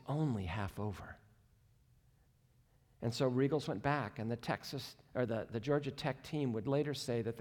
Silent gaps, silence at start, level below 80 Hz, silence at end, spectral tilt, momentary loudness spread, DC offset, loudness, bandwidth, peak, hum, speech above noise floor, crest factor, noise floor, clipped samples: none; 0.05 s; -66 dBFS; 0 s; -6.5 dB/octave; 9 LU; under 0.1%; -38 LUFS; 18 kHz; -22 dBFS; none; 33 dB; 18 dB; -70 dBFS; under 0.1%